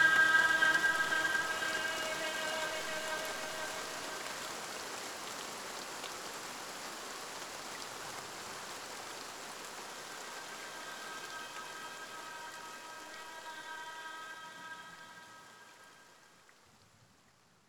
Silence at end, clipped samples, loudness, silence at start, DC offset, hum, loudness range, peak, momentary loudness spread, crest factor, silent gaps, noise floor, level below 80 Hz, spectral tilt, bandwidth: 0.85 s; under 0.1%; -37 LUFS; 0 s; under 0.1%; none; 14 LU; -16 dBFS; 17 LU; 22 dB; none; -67 dBFS; -74 dBFS; -0.5 dB/octave; over 20 kHz